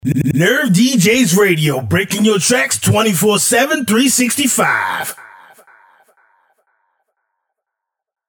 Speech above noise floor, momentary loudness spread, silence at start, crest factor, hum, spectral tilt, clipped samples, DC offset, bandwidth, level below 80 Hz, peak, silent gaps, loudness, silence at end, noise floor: 67 dB; 5 LU; 0.05 s; 14 dB; none; -4 dB/octave; under 0.1%; under 0.1%; over 20 kHz; -50 dBFS; 0 dBFS; none; -13 LUFS; 3 s; -81 dBFS